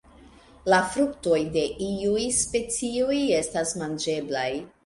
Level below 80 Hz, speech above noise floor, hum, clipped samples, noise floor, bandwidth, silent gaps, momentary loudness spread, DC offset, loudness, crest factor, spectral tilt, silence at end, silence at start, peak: -52 dBFS; 26 dB; none; under 0.1%; -51 dBFS; 11.5 kHz; none; 6 LU; under 0.1%; -25 LUFS; 18 dB; -3.5 dB/octave; 0.15 s; 0.2 s; -8 dBFS